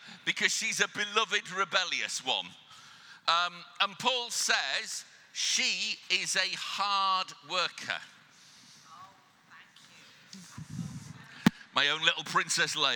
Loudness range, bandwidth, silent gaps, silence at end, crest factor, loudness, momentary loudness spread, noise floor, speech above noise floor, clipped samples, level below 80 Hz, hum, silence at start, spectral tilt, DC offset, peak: 10 LU; 19 kHz; none; 0 s; 28 dB; -29 LUFS; 15 LU; -58 dBFS; 27 dB; under 0.1%; -72 dBFS; none; 0 s; -1.5 dB/octave; under 0.1%; -6 dBFS